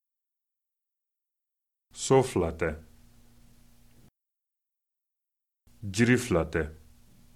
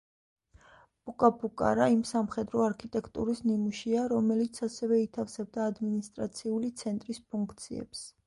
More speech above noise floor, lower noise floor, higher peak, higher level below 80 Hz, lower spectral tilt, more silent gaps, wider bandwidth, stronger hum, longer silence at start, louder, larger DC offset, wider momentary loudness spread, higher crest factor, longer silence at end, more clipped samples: first, 61 dB vs 29 dB; first, -87 dBFS vs -59 dBFS; about the same, -8 dBFS vs -8 dBFS; first, -50 dBFS vs -62 dBFS; about the same, -5.5 dB/octave vs -6 dB/octave; neither; first, 14.5 kHz vs 11.5 kHz; neither; first, 1.95 s vs 1.05 s; first, -27 LUFS vs -31 LUFS; neither; first, 18 LU vs 11 LU; about the same, 24 dB vs 22 dB; first, 0.6 s vs 0.15 s; neither